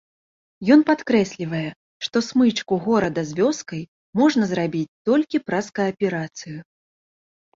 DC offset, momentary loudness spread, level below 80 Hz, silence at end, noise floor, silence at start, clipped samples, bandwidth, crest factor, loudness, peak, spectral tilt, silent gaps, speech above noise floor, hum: under 0.1%; 15 LU; -60 dBFS; 0.95 s; under -90 dBFS; 0.6 s; under 0.1%; 7.6 kHz; 20 dB; -21 LUFS; -2 dBFS; -5.5 dB/octave; 1.76-2.00 s, 3.88-4.13 s, 4.88-5.05 s; over 69 dB; none